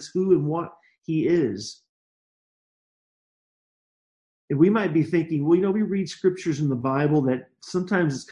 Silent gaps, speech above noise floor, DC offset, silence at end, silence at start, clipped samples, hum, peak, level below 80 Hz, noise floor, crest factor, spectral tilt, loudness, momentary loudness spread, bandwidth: 1.89-4.48 s; over 67 dB; under 0.1%; 0 s; 0 s; under 0.1%; none; -6 dBFS; -66 dBFS; under -90 dBFS; 18 dB; -7 dB/octave; -23 LUFS; 10 LU; 10.5 kHz